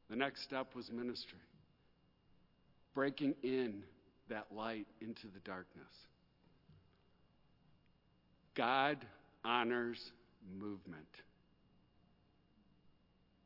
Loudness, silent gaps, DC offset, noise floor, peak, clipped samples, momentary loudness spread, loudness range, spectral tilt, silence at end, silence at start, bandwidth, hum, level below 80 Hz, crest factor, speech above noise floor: -42 LUFS; none; under 0.1%; -73 dBFS; -20 dBFS; under 0.1%; 21 LU; 15 LU; -2.5 dB/octave; 0.55 s; 0.1 s; 5.8 kHz; none; -80 dBFS; 24 dB; 31 dB